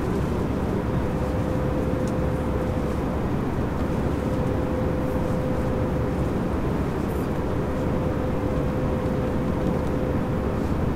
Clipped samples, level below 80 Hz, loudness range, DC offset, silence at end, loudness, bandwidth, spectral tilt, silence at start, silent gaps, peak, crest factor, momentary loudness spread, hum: under 0.1%; -32 dBFS; 0 LU; under 0.1%; 0 s; -25 LUFS; 16 kHz; -8 dB/octave; 0 s; none; -10 dBFS; 14 dB; 1 LU; none